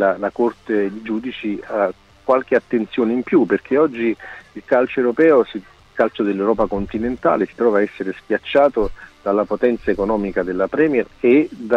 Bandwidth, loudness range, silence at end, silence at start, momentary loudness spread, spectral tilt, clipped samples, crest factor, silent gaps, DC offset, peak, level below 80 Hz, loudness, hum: 7 kHz; 2 LU; 0 s; 0 s; 10 LU; -7.5 dB/octave; under 0.1%; 14 dB; none; under 0.1%; -4 dBFS; -44 dBFS; -19 LUFS; none